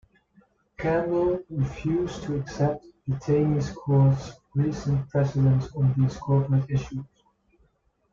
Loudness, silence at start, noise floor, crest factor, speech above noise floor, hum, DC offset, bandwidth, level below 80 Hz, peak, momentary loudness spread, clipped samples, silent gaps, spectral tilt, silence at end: -25 LUFS; 0.8 s; -67 dBFS; 14 dB; 43 dB; none; under 0.1%; 7.2 kHz; -48 dBFS; -10 dBFS; 9 LU; under 0.1%; none; -8.5 dB/octave; 1.1 s